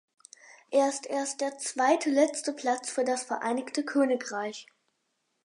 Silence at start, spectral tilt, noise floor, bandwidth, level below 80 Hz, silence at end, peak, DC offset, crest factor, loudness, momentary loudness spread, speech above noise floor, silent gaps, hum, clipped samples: 0.45 s; -2 dB/octave; -78 dBFS; 11.5 kHz; -86 dBFS; 0.85 s; -10 dBFS; under 0.1%; 18 dB; -29 LUFS; 7 LU; 49 dB; none; none; under 0.1%